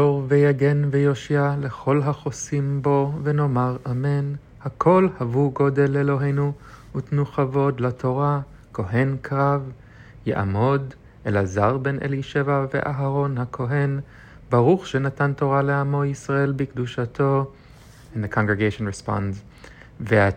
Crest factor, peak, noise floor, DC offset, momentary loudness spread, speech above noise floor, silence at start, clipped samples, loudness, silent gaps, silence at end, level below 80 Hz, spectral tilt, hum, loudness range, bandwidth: 18 dB; -4 dBFS; -46 dBFS; under 0.1%; 11 LU; 25 dB; 0 s; under 0.1%; -22 LUFS; none; 0 s; -50 dBFS; -7.5 dB/octave; none; 3 LU; 9 kHz